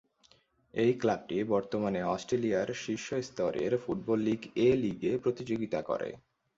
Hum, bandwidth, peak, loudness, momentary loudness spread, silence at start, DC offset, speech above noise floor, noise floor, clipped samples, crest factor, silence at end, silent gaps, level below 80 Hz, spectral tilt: none; 7.8 kHz; -14 dBFS; -32 LUFS; 8 LU; 0.75 s; under 0.1%; 35 dB; -66 dBFS; under 0.1%; 16 dB; 0.4 s; none; -64 dBFS; -6 dB/octave